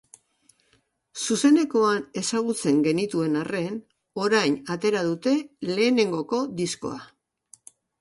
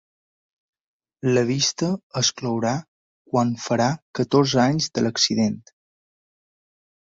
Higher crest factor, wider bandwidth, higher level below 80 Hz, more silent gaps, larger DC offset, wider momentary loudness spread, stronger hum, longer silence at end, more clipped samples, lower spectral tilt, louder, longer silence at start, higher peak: about the same, 18 dB vs 20 dB; first, 11.5 kHz vs 8 kHz; second, -68 dBFS vs -60 dBFS; second, none vs 2.03-2.10 s, 2.88-3.25 s, 4.02-4.14 s; neither; first, 13 LU vs 7 LU; neither; second, 0.95 s vs 1.6 s; neither; about the same, -4.5 dB/octave vs -4.5 dB/octave; about the same, -24 LUFS vs -22 LUFS; about the same, 1.15 s vs 1.25 s; second, -8 dBFS vs -4 dBFS